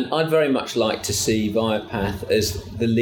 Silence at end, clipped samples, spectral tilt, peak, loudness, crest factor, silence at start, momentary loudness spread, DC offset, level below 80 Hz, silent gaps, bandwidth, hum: 0 s; under 0.1%; -4.5 dB/octave; -6 dBFS; -22 LUFS; 14 dB; 0 s; 6 LU; under 0.1%; -44 dBFS; none; 19 kHz; none